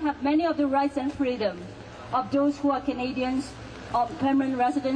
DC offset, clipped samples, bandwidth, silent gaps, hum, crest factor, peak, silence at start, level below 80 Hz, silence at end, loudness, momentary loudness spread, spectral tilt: under 0.1%; under 0.1%; 9.8 kHz; none; none; 12 dB; -14 dBFS; 0 s; -52 dBFS; 0 s; -26 LUFS; 11 LU; -6 dB/octave